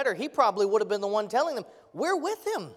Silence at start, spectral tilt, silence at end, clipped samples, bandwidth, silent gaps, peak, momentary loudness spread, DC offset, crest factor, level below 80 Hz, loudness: 0 s; -4 dB/octave; 0 s; under 0.1%; 15 kHz; none; -10 dBFS; 8 LU; under 0.1%; 18 dB; -78 dBFS; -27 LUFS